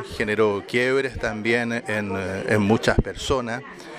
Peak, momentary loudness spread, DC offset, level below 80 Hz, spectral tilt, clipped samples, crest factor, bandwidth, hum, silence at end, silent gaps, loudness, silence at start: -4 dBFS; 7 LU; under 0.1%; -38 dBFS; -5.5 dB/octave; under 0.1%; 20 dB; 14.5 kHz; none; 0 s; none; -23 LUFS; 0 s